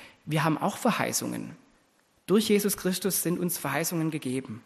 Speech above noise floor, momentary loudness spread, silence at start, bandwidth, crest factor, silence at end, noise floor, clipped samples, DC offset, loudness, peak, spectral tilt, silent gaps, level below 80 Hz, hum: 39 dB; 9 LU; 0 s; 13 kHz; 18 dB; 0.05 s; -66 dBFS; under 0.1%; under 0.1%; -27 LUFS; -10 dBFS; -4.5 dB/octave; none; -66 dBFS; none